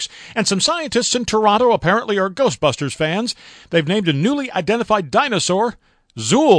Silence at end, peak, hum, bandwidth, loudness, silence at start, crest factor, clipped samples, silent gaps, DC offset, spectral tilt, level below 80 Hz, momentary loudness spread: 0 s; 0 dBFS; none; 10.5 kHz; -18 LUFS; 0 s; 18 dB; under 0.1%; none; under 0.1%; -4 dB/octave; -50 dBFS; 6 LU